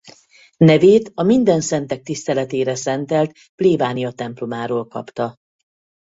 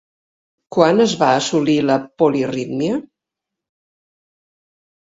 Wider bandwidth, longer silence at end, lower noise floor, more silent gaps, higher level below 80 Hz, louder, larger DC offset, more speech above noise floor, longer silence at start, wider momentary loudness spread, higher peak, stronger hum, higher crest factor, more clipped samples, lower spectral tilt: about the same, 8 kHz vs 8 kHz; second, 0.7 s vs 2 s; second, -50 dBFS vs -83 dBFS; first, 3.49-3.58 s vs none; about the same, -58 dBFS vs -60 dBFS; about the same, -18 LUFS vs -17 LUFS; neither; second, 33 dB vs 67 dB; second, 0.05 s vs 0.7 s; first, 13 LU vs 8 LU; about the same, -2 dBFS vs 0 dBFS; neither; about the same, 16 dB vs 20 dB; neither; about the same, -6 dB/octave vs -5 dB/octave